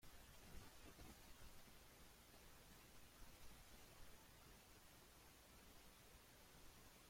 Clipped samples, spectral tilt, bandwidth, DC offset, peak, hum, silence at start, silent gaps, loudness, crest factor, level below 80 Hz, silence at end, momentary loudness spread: under 0.1%; -3 dB/octave; 16.5 kHz; under 0.1%; -46 dBFS; none; 0 s; none; -65 LUFS; 18 dB; -70 dBFS; 0 s; 3 LU